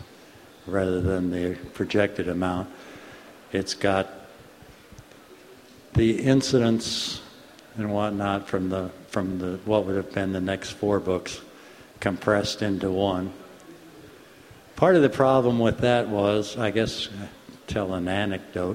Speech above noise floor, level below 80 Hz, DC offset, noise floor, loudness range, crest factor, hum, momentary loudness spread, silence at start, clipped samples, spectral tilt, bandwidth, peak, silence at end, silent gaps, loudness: 25 dB; -50 dBFS; under 0.1%; -49 dBFS; 6 LU; 22 dB; none; 19 LU; 0 s; under 0.1%; -5.5 dB/octave; 16 kHz; -4 dBFS; 0 s; none; -25 LUFS